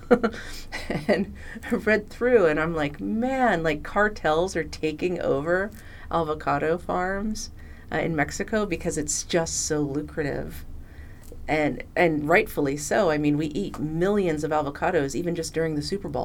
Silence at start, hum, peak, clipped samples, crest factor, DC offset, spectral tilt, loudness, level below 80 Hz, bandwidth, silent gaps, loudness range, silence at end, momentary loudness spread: 0 s; none; -4 dBFS; under 0.1%; 20 dB; under 0.1%; -5 dB/octave; -25 LUFS; -42 dBFS; 18.5 kHz; none; 4 LU; 0 s; 12 LU